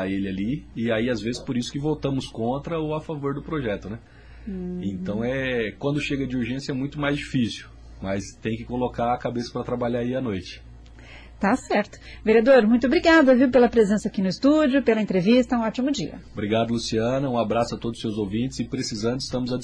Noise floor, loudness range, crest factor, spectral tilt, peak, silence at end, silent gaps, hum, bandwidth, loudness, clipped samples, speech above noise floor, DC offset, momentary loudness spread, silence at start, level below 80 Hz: -44 dBFS; 10 LU; 16 dB; -6 dB/octave; -6 dBFS; 0 s; none; none; 10.5 kHz; -23 LUFS; under 0.1%; 21 dB; under 0.1%; 13 LU; 0 s; -46 dBFS